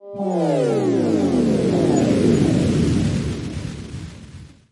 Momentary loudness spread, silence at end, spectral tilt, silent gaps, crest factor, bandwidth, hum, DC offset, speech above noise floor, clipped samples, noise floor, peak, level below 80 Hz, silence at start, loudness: 16 LU; 0.25 s; -7 dB/octave; none; 16 dB; 11.5 kHz; none; under 0.1%; 23 dB; under 0.1%; -40 dBFS; -4 dBFS; -40 dBFS; 0.05 s; -19 LUFS